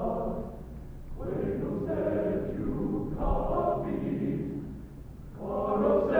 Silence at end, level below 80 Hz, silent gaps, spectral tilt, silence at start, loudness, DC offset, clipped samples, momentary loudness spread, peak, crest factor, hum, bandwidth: 0 s; -40 dBFS; none; -10 dB/octave; 0 s; -31 LUFS; under 0.1%; under 0.1%; 16 LU; -14 dBFS; 18 dB; none; over 20 kHz